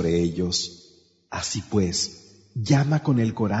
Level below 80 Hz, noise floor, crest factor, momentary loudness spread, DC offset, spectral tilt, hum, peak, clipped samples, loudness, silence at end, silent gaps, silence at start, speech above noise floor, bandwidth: -50 dBFS; -45 dBFS; 18 dB; 12 LU; under 0.1%; -5 dB/octave; none; -6 dBFS; under 0.1%; -24 LUFS; 0 s; none; 0 s; 22 dB; 8 kHz